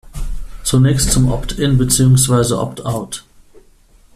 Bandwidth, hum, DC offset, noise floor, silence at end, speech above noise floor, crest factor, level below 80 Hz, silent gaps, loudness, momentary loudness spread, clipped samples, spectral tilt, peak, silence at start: 14.5 kHz; none; under 0.1%; -48 dBFS; 0.95 s; 34 dB; 16 dB; -28 dBFS; none; -14 LUFS; 18 LU; under 0.1%; -5 dB/octave; 0 dBFS; 0.05 s